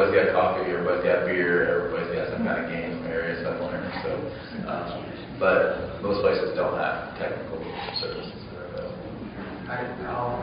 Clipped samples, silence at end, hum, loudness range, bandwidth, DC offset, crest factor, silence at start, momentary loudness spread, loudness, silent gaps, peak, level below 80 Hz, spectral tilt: under 0.1%; 0 s; none; 7 LU; 5.2 kHz; under 0.1%; 18 dB; 0 s; 14 LU; -27 LUFS; none; -8 dBFS; -50 dBFS; -4 dB/octave